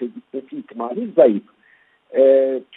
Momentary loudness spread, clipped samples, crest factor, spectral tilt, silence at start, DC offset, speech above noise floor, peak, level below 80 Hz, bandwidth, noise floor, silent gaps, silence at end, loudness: 18 LU; under 0.1%; 18 dB; -10.5 dB/octave; 0 s; under 0.1%; 40 dB; 0 dBFS; -72 dBFS; 3.9 kHz; -56 dBFS; none; 0.15 s; -17 LUFS